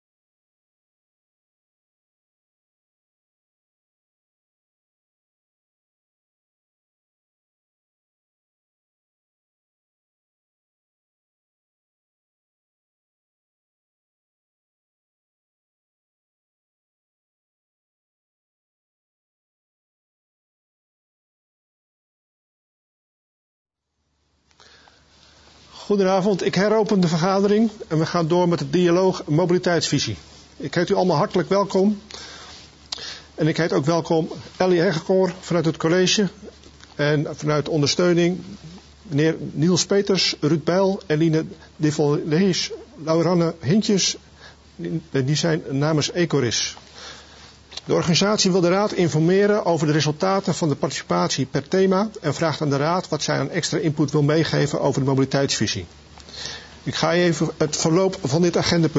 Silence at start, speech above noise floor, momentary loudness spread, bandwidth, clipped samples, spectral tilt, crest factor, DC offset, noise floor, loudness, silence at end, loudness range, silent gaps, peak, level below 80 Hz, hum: 25.75 s; 54 dB; 13 LU; 8 kHz; under 0.1%; -5 dB/octave; 20 dB; under 0.1%; -74 dBFS; -20 LUFS; 0 s; 4 LU; none; -4 dBFS; -56 dBFS; none